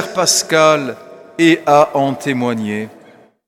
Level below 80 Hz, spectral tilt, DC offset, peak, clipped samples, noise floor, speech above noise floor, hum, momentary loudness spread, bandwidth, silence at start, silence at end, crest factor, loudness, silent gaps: -64 dBFS; -3.5 dB/octave; under 0.1%; 0 dBFS; under 0.1%; -45 dBFS; 31 dB; none; 16 LU; 16 kHz; 0 s; 0.6 s; 16 dB; -14 LUFS; none